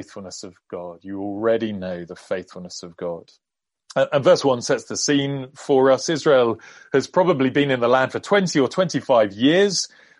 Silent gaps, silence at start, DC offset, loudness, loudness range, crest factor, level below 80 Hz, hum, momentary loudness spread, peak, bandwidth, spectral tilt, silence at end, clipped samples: none; 0 s; under 0.1%; -20 LUFS; 9 LU; 18 dB; -66 dBFS; none; 18 LU; -4 dBFS; 11.5 kHz; -4.5 dB/octave; 0.35 s; under 0.1%